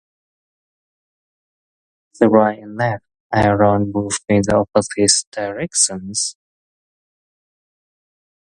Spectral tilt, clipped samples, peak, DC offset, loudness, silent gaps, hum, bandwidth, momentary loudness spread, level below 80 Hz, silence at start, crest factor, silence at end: -4 dB/octave; under 0.1%; 0 dBFS; under 0.1%; -17 LUFS; 3.20-3.30 s, 5.27-5.32 s; none; 11.5 kHz; 8 LU; -46 dBFS; 2.2 s; 20 dB; 2.15 s